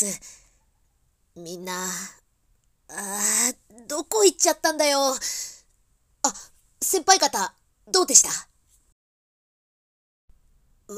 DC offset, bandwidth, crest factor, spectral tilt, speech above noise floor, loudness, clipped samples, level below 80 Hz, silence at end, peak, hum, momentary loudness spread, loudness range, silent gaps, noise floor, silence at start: under 0.1%; 16 kHz; 26 dB; -0.5 dB/octave; 44 dB; -21 LUFS; under 0.1%; -64 dBFS; 0 s; 0 dBFS; none; 21 LU; 7 LU; 8.92-10.28 s; -67 dBFS; 0 s